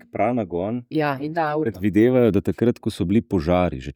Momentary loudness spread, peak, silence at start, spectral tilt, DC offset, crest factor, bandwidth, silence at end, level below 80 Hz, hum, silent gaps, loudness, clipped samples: 8 LU; -6 dBFS; 0.15 s; -8 dB/octave; under 0.1%; 14 dB; 17.5 kHz; 0.05 s; -44 dBFS; none; none; -21 LUFS; under 0.1%